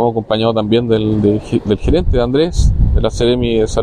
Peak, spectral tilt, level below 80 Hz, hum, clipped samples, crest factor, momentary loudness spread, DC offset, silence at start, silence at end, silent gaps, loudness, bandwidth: -2 dBFS; -7 dB/octave; -18 dBFS; none; under 0.1%; 12 dB; 2 LU; under 0.1%; 0 s; 0 s; none; -14 LUFS; 10 kHz